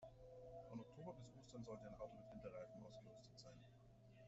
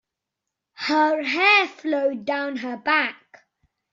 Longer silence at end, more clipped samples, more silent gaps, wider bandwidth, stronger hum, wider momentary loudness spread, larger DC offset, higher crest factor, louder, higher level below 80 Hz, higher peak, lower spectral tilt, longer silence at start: second, 0 s vs 0.8 s; neither; neither; about the same, 8 kHz vs 7.6 kHz; neither; second, 8 LU vs 12 LU; neither; about the same, 18 dB vs 20 dB; second, -59 LUFS vs -21 LUFS; about the same, -74 dBFS vs -74 dBFS; second, -40 dBFS vs -4 dBFS; first, -6.5 dB/octave vs 1 dB/octave; second, 0 s vs 0.8 s